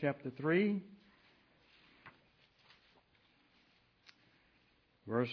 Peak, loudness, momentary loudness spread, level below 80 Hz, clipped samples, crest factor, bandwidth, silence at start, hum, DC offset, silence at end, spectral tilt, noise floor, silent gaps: -20 dBFS; -36 LUFS; 27 LU; -80 dBFS; under 0.1%; 20 dB; 5.4 kHz; 0 s; none; under 0.1%; 0 s; -6 dB/octave; -73 dBFS; none